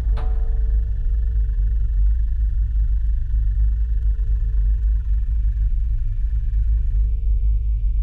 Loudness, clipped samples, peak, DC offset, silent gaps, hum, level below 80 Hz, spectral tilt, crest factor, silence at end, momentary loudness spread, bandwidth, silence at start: -23 LUFS; under 0.1%; -10 dBFS; under 0.1%; none; none; -18 dBFS; -9.5 dB/octave; 8 dB; 0 s; 2 LU; 1.9 kHz; 0 s